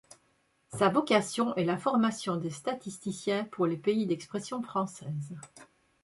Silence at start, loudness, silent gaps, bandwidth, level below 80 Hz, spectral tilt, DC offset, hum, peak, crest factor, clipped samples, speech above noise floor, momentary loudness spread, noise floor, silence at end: 0.7 s; -31 LUFS; none; 11.5 kHz; -72 dBFS; -5.5 dB/octave; under 0.1%; none; -10 dBFS; 20 dB; under 0.1%; 41 dB; 12 LU; -71 dBFS; 0.4 s